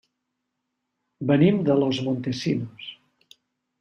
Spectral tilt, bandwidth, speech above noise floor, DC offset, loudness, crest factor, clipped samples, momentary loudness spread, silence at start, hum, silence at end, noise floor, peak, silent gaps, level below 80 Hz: -7 dB/octave; 9 kHz; 58 dB; under 0.1%; -23 LUFS; 20 dB; under 0.1%; 18 LU; 1.2 s; none; 0.85 s; -80 dBFS; -6 dBFS; none; -64 dBFS